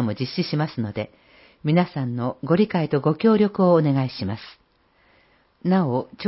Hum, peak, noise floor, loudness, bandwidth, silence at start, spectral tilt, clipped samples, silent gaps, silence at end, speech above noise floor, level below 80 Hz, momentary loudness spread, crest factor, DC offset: none; -6 dBFS; -61 dBFS; -22 LUFS; 5.8 kHz; 0 s; -11.5 dB/octave; under 0.1%; none; 0 s; 39 dB; -56 dBFS; 12 LU; 16 dB; under 0.1%